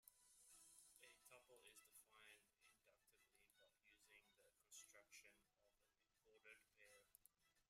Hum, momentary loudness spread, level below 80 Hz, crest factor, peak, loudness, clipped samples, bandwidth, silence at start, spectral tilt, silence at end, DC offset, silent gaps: none; 5 LU; under -90 dBFS; 24 dB; -48 dBFS; -68 LUFS; under 0.1%; 16 kHz; 0 s; 0 dB/octave; 0 s; under 0.1%; none